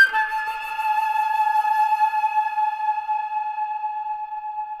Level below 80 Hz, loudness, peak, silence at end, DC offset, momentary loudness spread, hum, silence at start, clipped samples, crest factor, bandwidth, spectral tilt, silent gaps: -64 dBFS; -23 LUFS; -6 dBFS; 0 s; under 0.1%; 9 LU; none; 0 s; under 0.1%; 16 dB; 13.5 kHz; 1.5 dB/octave; none